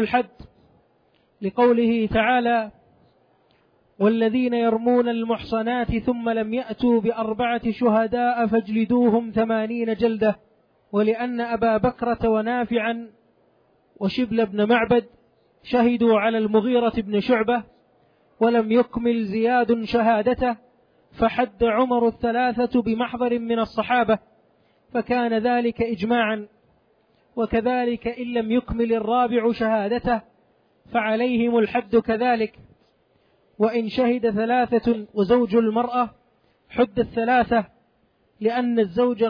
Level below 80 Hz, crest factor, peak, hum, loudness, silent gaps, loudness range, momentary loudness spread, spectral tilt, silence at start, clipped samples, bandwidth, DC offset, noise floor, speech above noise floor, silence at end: -48 dBFS; 14 dB; -8 dBFS; none; -22 LUFS; none; 3 LU; 6 LU; -8.5 dB/octave; 0 s; under 0.1%; 5.2 kHz; under 0.1%; -64 dBFS; 43 dB; 0 s